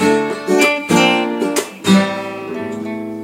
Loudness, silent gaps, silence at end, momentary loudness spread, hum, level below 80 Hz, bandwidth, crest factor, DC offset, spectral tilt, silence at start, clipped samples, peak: -16 LUFS; none; 0 s; 12 LU; none; -60 dBFS; 16.5 kHz; 16 dB; under 0.1%; -4.5 dB/octave; 0 s; under 0.1%; 0 dBFS